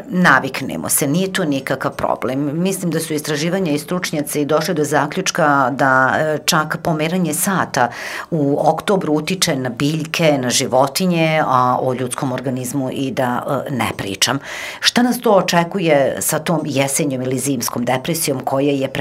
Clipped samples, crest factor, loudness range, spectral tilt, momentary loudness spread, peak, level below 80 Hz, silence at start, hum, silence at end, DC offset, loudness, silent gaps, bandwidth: under 0.1%; 18 dB; 3 LU; -4 dB/octave; 7 LU; 0 dBFS; -54 dBFS; 0 s; none; 0 s; under 0.1%; -17 LUFS; none; 16 kHz